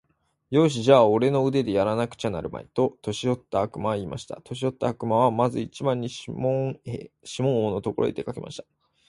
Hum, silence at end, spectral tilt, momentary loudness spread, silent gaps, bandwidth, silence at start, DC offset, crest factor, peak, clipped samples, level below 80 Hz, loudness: none; 0.5 s; -6.5 dB/octave; 15 LU; none; 11.5 kHz; 0.5 s; under 0.1%; 22 dB; -4 dBFS; under 0.1%; -56 dBFS; -25 LUFS